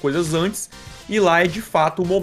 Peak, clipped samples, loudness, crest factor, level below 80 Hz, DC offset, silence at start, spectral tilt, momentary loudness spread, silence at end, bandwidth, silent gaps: -4 dBFS; under 0.1%; -19 LUFS; 16 dB; -46 dBFS; under 0.1%; 0.05 s; -4.5 dB/octave; 14 LU; 0 s; 15.5 kHz; none